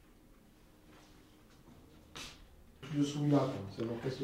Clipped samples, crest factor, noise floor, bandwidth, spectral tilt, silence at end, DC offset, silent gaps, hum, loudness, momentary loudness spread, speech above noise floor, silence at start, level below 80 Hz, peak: under 0.1%; 22 dB; -62 dBFS; 15 kHz; -6.5 dB/octave; 0 s; under 0.1%; none; none; -36 LUFS; 21 LU; 28 dB; 0.3 s; -64 dBFS; -16 dBFS